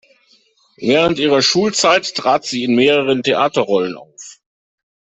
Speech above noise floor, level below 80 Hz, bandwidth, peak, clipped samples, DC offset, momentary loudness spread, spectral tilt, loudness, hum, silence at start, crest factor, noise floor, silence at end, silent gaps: 40 dB; -56 dBFS; 8.4 kHz; -2 dBFS; under 0.1%; under 0.1%; 11 LU; -3.5 dB/octave; -15 LUFS; none; 0.8 s; 14 dB; -55 dBFS; 0.8 s; none